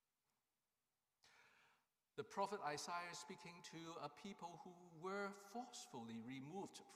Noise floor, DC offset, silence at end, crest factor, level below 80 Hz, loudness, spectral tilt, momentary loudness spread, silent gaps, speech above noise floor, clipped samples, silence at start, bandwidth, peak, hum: under -90 dBFS; under 0.1%; 0 s; 22 dB; under -90 dBFS; -52 LUFS; -4 dB/octave; 10 LU; none; over 38 dB; under 0.1%; 1.25 s; 15.5 kHz; -32 dBFS; none